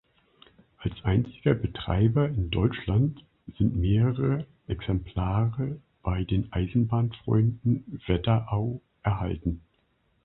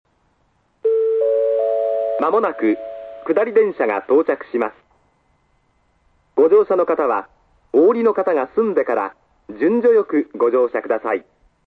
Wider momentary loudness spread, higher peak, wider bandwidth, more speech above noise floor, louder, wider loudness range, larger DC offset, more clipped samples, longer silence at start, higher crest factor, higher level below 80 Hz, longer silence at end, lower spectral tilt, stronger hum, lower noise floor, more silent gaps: about the same, 10 LU vs 10 LU; second, -8 dBFS vs -4 dBFS; about the same, 4.1 kHz vs 4.4 kHz; about the same, 44 dB vs 46 dB; second, -27 LUFS vs -18 LUFS; about the same, 2 LU vs 3 LU; neither; neither; about the same, 0.8 s vs 0.85 s; about the same, 18 dB vs 16 dB; first, -40 dBFS vs -64 dBFS; first, 0.65 s vs 0.45 s; first, -12 dB/octave vs -8.5 dB/octave; neither; first, -69 dBFS vs -63 dBFS; neither